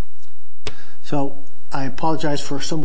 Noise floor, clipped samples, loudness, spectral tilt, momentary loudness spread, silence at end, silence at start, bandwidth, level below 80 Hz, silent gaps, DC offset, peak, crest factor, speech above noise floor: -55 dBFS; under 0.1%; -26 LUFS; -5.5 dB/octave; 14 LU; 0 s; 0 s; 8 kHz; -50 dBFS; none; 30%; -6 dBFS; 18 dB; 32 dB